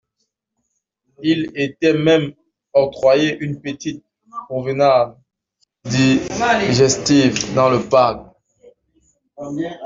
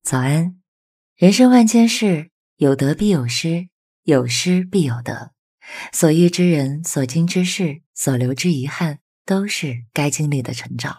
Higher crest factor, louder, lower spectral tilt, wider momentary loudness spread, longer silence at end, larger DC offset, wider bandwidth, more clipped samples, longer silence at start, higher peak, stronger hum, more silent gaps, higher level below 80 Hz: about the same, 16 dB vs 18 dB; about the same, -17 LUFS vs -18 LUFS; about the same, -5 dB/octave vs -5.5 dB/octave; first, 15 LU vs 12 LU; about the same, 0 s vs 0.05 s; neither; second, 7.8 kHz vs 16 kHz; neither; first, 1.2 s vs 0.05 s; about the same, -2 dBFS vs 0 dBFS; neither; second, none vs 0.68-1.16 s, 2.32-2.57 s, 3.72-4.03 s, 5.39-5.58 s, 7.86-7.94 s, 9.01-9.25 s; about the same, -52 dBFS vs -56 dBFS